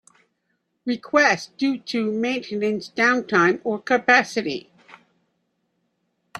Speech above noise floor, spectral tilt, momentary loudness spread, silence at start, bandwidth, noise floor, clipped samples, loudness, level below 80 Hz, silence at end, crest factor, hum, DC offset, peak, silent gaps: 52 dB; -4 dB/octave; 11 LU; 0.85 s; 12 kHz; -73 dBFS; under 0.1%; -21 LUFS; -70 dBFS; 0 s; 22 dB; none; under 0.1%; -2 dBFS; none